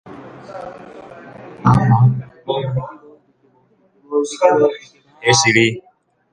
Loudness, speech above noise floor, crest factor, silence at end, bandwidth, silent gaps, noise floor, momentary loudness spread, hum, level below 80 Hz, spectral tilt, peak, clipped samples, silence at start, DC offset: -16 LUFS; 41 dB; 18 dB; 0.5 s; 9.8 kHz; none; -57 dBFS; 24 LU; none; -50 dBFS; -5 dB/octave; 0 dBFS; under 0.1%; 0.05 s; under 0.1%